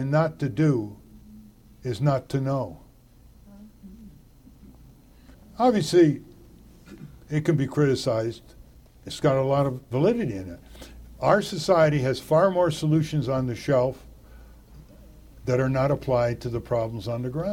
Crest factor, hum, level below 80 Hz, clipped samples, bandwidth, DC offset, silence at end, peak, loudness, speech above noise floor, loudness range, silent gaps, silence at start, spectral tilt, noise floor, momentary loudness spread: 20 dB; none; -50 dBFS; under 0.1%; 16 kHz; under 0.1%; 0 s; -6 dBFS; -24 LUFS; 29 dB; 8 LU; none; 0 s; -7 dB/octave; -53 dBFS; 19 LU